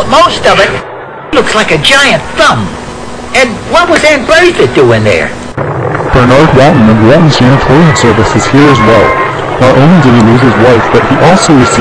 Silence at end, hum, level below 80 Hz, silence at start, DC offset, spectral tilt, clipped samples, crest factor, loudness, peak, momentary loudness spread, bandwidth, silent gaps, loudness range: 0 s; none; -26 dBFS; 0 s; under 0.1%; -5.5 dB/octave; 20%; 6 dB; -5 LUFS; 0 dBFS; 9 LU; 11 kHz; none; 3 LU